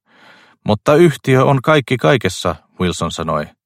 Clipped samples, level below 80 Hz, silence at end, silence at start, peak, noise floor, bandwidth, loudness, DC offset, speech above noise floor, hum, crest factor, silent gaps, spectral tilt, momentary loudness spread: under 0.1%; -46 dBFS; 0.2 s; 0.65 s; 0 dBFS; -47 dBFS; 15.5 kHz; -15 LUFS; under 0.1%; 33 dB; none; 16 dB; none; -6 dB/octave; 9 LU